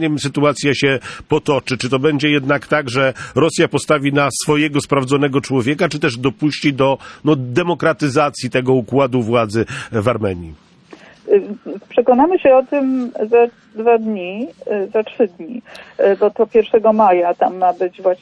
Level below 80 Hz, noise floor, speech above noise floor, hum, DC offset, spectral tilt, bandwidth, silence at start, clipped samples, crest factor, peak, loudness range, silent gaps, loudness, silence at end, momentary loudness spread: -52 dBFS; -42 dBFS; 27 dB; none; under 0.1%; -5.5 dB/octave; 11 kHz; 0 s; under 0.1%; 14 dB; -2 dBFS; 3 LU; none; -16 LUFS; 0.05 s; 8 LU